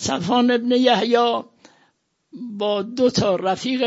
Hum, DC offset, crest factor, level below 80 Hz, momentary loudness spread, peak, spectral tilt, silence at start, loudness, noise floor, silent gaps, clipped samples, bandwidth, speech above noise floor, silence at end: none; under 0.1%; 18 dB; -56 dBFS; 10 LU; -4 dBFS; -4.5 dB/octave; 0 s; -19 LUFS; -65 dBFS; none; under 0.1%; 8 kHz; 46 dB; 0 s